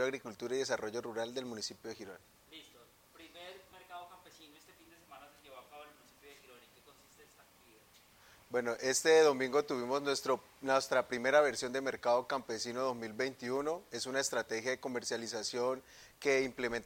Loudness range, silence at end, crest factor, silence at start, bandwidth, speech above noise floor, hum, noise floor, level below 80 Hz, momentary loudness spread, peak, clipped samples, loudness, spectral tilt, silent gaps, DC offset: 23 LU; 0 s; 22 dB; 0 s; 16.5 kHz; 29 dB; none; -64 dBFS; -74 dBFS; 25 LU; -14 dBFS; under 0.1%; -34 LUFS; -2.5 dB/octave; none; under 0.1%